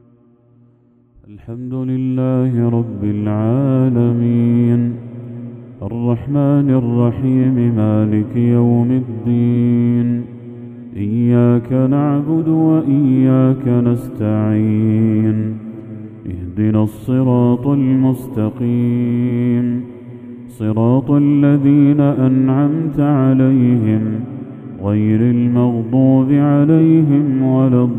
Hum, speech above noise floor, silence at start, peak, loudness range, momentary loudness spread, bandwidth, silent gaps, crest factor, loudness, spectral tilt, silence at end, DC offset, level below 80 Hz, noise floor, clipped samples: none; 38 dB; 1.3 s; 0 dBFS; 4 LU; 16 LU; 3.7 kHz; none; 14 dB; -15 LUFS; -11 dB/octave; 0 s; under 0.1%; -50 dBFS; -52 dBFS; under 0.1%